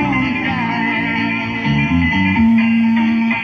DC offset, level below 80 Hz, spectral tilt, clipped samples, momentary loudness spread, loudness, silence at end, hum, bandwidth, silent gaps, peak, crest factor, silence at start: under 0.1%; -34 dBFS; -7 dB/octave; under 0.1%; 5 LU; -15 LUFS; 0 s; none; 6.4 kHz; none; -4 dBFS; 10 dB; 0 s